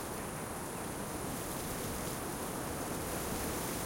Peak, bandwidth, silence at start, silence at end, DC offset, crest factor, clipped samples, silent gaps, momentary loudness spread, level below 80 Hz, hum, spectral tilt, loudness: -24 dBFS; 16.5 kHz; 0 s; 0 s; under 0.1%; 14 dB; under 0.1%; none; 4 LU; -52 dBFS; none; -4 dB/octave; -39 LUFS